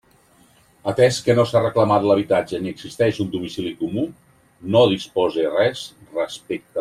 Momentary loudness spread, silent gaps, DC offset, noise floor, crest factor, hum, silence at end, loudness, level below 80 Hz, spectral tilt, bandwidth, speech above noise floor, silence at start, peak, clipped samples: 13 LU; none; under 0.1%; -55 dBFS; 18 dB; none; 0 s; -20 LUFS; -58 dBFS; -6 dB/octave; 14.5 kHz; 35 dB; 0.85 s; -2 dBFS; under 0.1%